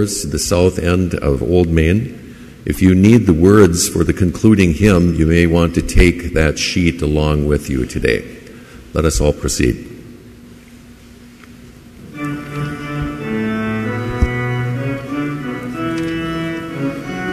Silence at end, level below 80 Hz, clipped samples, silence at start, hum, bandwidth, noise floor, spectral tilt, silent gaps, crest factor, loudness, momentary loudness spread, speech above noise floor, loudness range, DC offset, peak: 0 s; -26 dBFS; under 0.1%; 0 s; none; 15 kHz; -40 dBFS; -6 dB/octave; none; 16 dB; -15 LUFS; 13 LU; 27 dB; 12 LU; under 0.1%; 0 dBFS